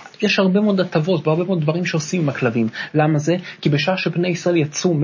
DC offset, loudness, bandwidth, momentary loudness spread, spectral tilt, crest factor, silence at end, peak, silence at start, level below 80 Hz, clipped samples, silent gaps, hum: under 0.1%; -19 LUFS; 7.4 kHz; 5 LU; -6 dB/octave; 14 dB; 0 s; -4 dBFS; 0 s; -64 dBFS; under 0.1%; none; none